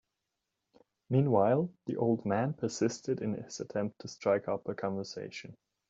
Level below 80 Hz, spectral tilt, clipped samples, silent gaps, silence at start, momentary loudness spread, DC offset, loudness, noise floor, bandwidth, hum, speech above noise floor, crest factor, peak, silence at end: -74 dBFS; -6.5 dB/octave; under 0.1%; none; 1.1 s; 13 LU; under 0.1%; -33 LUFS; -86 dBFS; 8 kHz; none; 54 dB; 20 dB; -14 dBFS; 0.35 s